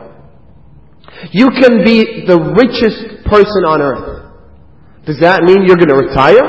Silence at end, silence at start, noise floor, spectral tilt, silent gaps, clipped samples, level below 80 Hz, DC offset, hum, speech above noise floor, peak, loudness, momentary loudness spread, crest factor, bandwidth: 0 s; 1.15 s; -42 dBFS; -7.5 dB/octave; none; 2%; -34 dBFS; 0.8%; none; 34 dB; 0 dBFS; -9 LUFS; 14 LU; 10 dB; 8 kHz